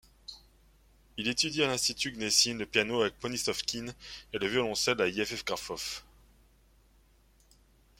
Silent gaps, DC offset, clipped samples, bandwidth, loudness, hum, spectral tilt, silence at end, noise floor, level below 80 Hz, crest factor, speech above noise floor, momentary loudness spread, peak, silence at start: none; under 0.1%; under 0.1%; 16.5 kHz; -30 LUFS; none; -2 dB/octave; 2 s; -64 dBFS; -60 dBFS; 24 dB; 32 dB; 17 LU; -10 dBFS; 0.3 s